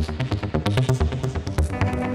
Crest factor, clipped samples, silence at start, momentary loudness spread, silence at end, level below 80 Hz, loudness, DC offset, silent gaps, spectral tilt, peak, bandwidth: 18 dB; under 0.1%; 0 s; 5 LU; 0 s; -30 dBFS; -24 LUFS; under 0.1%; none; -6.5 dB/octave; -6 dBFS; 13 kHz